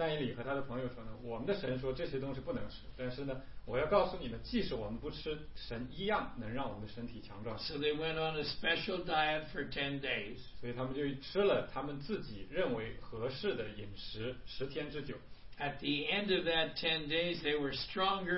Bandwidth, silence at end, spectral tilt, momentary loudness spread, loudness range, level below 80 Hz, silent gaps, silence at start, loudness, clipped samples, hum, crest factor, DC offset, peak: 5.8 kHz; 0 s; -3 dB/octave; 12 LU; 5 LU; -54 dBFS; none; 0 s; -38 LUFS; under 0.1%; none; 20 dB; 0.3%; -16 dBFS